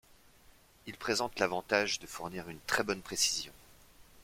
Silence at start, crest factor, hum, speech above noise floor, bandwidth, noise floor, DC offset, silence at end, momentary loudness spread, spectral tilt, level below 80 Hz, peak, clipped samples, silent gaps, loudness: 0.85 s; 24 dB; none; 27 dB; 16.5 kHz; -61 dBFS; under 0.1%; 0 s; 13 LU; -1.5 dB/octave; -64 dBFS; -12 dBFS; under 0.1%; none; -33 LUFS